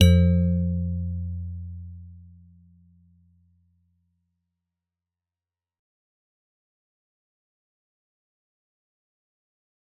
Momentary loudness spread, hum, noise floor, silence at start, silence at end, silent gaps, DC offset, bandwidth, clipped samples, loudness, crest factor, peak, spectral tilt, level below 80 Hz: 24 LU; none; under -90 dBFS; 0 s; 7.8 s; none; under 0.1%; 4 kHz; under 0.1%; -24 LUFS; 24 dB; -4 dBFS; -8 dB/octave; -46 dBFS